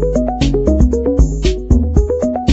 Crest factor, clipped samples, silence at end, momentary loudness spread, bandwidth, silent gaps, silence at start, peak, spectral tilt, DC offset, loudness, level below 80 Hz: 12 dB; under 0.1%; 0 s; 3 LU; 8 kHz; none; 0 s; 0 dBFS; -7.5 dB/octave; under 0.1%; -15 LUFS; -16 dBFS